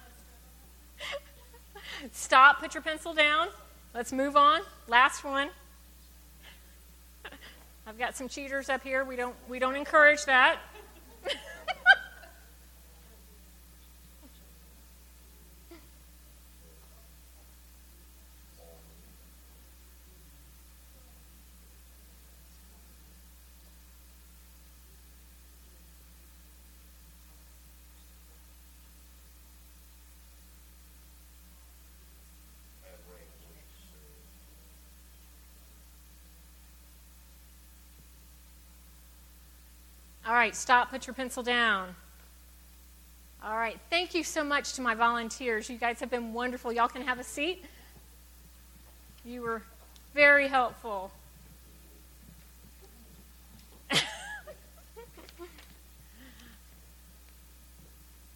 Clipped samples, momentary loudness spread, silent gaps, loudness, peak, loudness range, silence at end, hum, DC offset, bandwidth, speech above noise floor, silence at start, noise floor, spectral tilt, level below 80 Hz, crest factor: under 0.1%; 29 LU; none; -27 LUFS; -6 dBFS; 12 LU; 2.05 s; none; under 0.1%; 17.5 kHz; 27 dB; 1 s; -54 dBFS; -2 dB/octave; -56 dBFS; 28 dB